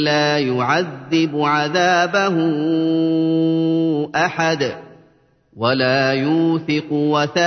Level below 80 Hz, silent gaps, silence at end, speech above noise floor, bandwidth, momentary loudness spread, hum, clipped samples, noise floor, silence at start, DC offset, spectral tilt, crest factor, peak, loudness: -64 dBFS; none; 0 s; 38 dB; 6.6 kHz; 4 LU; none; under 0.1%; -55 dBFS; 0 s; under 0.1%; -5.5 dB/octave; 14 dB; -4 dBFS; -18 LUFS